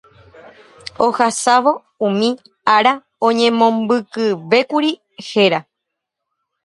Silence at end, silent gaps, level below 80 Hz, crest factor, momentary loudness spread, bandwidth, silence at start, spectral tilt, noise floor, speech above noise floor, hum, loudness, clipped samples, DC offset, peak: 1.05 s; none; -64 dBFS; 18 dB; 8 LU; 11.5 kHz; 1 s; -4 dB/octave; -79 dBFS; 64 dB; none; -16 LUFS; under 0.1%; under 0.1%; 0 dBFS